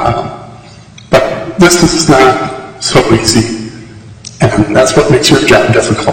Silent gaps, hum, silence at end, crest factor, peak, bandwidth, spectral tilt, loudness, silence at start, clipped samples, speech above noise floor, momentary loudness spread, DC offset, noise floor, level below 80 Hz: none; none; 0 s; 10 dB; 0 dBFS; 17 kHz; -4.5 dB/octave; -8 LUFS; 0 s; 0.5%; 26 dB; 16 LU; under 0.1%; -33 dBFS; -32 dBFS